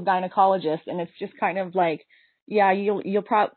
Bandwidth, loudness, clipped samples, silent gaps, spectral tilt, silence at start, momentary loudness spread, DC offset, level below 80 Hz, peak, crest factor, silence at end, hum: 4.5 kHz; -24 LUFS; under 0.1%; 2.42-2.46 s; -4 dB/octave; 0 s; 11 LU; under 0.1%; -78 dBFS; -8 dBFS; 16 dB; 0.05 s; none